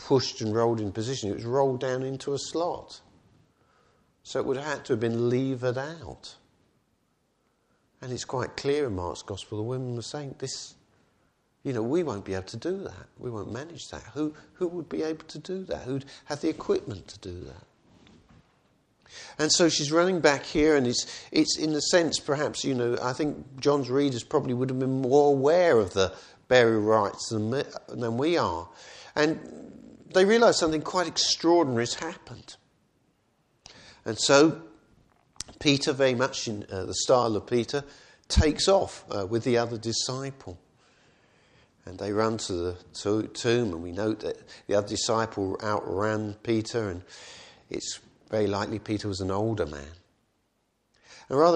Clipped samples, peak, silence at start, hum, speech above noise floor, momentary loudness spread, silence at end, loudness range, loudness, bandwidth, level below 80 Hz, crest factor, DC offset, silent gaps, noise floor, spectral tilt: under 0.1%; -4 dBFS; 0 s; none; 47 dB; 19 LU; 0 s; 9 LU; -27 LUFS; 10.5 kHz; -48 dBFS; 22 dB; under 0.1%; none; -73 dBFS; -4.5 dB/octave